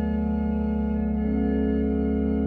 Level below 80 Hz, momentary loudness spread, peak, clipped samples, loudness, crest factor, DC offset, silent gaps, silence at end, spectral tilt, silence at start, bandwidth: -32 dBFS; 2 LU; -14 dBFS; under 0.1%; -25 LUFS; 10 dB; under 0.1%; none; 0 s; -11.5 dB/octave; 0 s; 3.2 kHz